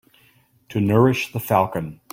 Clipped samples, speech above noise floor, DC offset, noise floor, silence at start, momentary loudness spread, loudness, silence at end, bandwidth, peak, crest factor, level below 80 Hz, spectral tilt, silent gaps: under 0.1%; 38 dB; under 0.1%; -58 dBFS; 0.7 s; 11 LU; -20 LUFS; 0.2 s; 16.5 kHz; -2 dBFS; 18 dB; -54 dBFS; -7 dB/octave; none